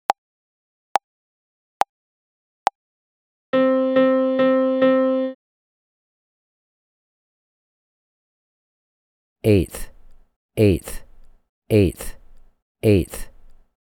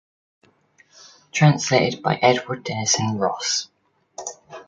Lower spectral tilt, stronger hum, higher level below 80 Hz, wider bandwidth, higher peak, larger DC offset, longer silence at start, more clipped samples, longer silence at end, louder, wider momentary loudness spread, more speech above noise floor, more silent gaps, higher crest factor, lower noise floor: first, -7 dB/octave vs -4 dB/octave; neither; first, -42 dBFS vs -62 dBFS; first, 18.5 kHz vs 9.4 kHz; about the same, 0 dBFS vs -2 dBFS; neither; second, 0.1 s vs 1.35 s; neither; first, 0.35 s vs 0.05 s; about the same, -20 LUFS vs -20 LUFS; about the same, 15 LU vs 17 LU; first, over 72 dB vs 38 dB; first, 0.18-0.95 s, 1.04-1.80 s, 1.89-2.66 s, 2.75-3.53 s, 5.35-9.36 s, 10.36-10.49 s, 11.49-11.62 s, 12.62-12.75 s vs none; about the same, 22 dB vs 20 dB; first, under -90 dBFS vs -58 dBFS